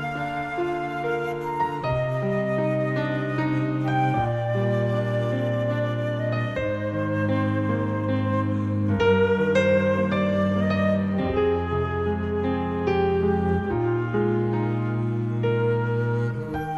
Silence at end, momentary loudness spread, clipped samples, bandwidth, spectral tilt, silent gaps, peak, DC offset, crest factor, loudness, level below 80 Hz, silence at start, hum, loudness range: 0 s; 6 LU; under 0.1%; 7.8 kHz; -8.5 dB/octave; none; -10 dBFS; under 0.1%; 14 dB; -24 LUFS; -48 dBFS; 0 s; none; 3 LU